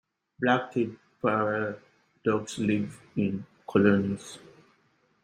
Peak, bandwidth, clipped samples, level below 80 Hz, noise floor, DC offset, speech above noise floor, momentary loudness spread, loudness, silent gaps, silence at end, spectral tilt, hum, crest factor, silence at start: -8 dBFS; 10.5 kHz; under 0.1%; -66 dBFS; -68 dBFS; under 0.1%; 41 dB; 13 LU; -28 LUFS; none; 0.85 s; -6.5 dB/octave; none; 22 dB; 0.4 s